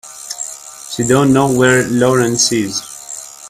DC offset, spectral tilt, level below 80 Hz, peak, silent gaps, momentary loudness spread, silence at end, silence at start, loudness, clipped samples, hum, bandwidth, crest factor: under 0.1%; -4 dB/octave; -48 dBFS; 0 dBFS; none; 16 LU; 0 s; 0.05 s; -13 LUFS; under 0.1%; none; 15.5 kHz; 14 dB